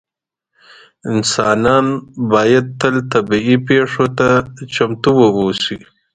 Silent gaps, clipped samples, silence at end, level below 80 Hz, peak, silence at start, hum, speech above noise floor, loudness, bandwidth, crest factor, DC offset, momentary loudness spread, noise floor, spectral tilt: none; under 0.1%; 0.4 s; -48 dBFS; 0 dBFS; 1.05 s; none; 67 dB; -14 LUFS; 9.4 kHz; 14 dB; under 0.1%; 9 LU; -81 dBFS; -5 dB/octave